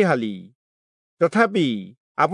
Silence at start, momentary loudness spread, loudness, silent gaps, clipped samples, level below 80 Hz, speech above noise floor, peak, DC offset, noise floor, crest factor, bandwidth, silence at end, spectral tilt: 0 s; 14 LU; -21 LUFS; 0.55-1.17 s, 1.97-2.15 s; under 0.1%; -76 dBFS; over 70 dB; -4 dBFS; under 0.1%; under -90 dBFS; 18 dB; 11 kHz; 0 s; -6.5 dB/octave